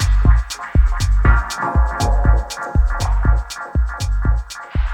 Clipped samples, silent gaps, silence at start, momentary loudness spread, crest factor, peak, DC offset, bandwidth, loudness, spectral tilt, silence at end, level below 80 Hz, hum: under 0.1%; none; 0 s; 6 LU; 14 dB; 0 dBFS; under 0.1%; 11.5 kHz; -19 LUFS; -5.5 dB/octave; 0 s; -16 dBFS; none